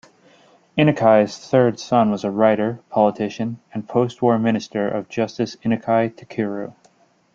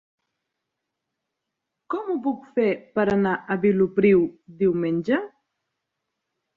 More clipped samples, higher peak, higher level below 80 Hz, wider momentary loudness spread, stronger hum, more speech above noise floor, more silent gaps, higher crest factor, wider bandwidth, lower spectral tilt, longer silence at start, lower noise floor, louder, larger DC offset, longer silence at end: neither; first, -2 dBFS vs -8 dBFS; about the same, -60 dBFS vs -60 dBFS; about the same, 10 LU vs 10 LU; neither; second, 38 dB vs 61 dB; neither; about the same, 18 dB vs 18 dB; first, 7.6 kHz vs 6.8 kHz; second, -7 dB/octave vs -9 dB/octave; second, 0.75 s vs 1.9 s; second, -57 dBFS vs -82 dBFS; first, -20 LUFS vs -23 LUFS; neither; second, 0.65 s vs 1.3 s